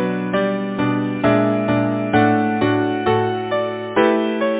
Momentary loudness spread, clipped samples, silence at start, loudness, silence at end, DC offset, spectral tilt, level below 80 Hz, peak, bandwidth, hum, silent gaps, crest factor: 5 LU; under 0.1%; 0 s; -18 LUFS; 0 s; under 0.1%; -11 dB/octave; -50 dBFS; -4 dBFS; 4 kHz; none; none; 14 dB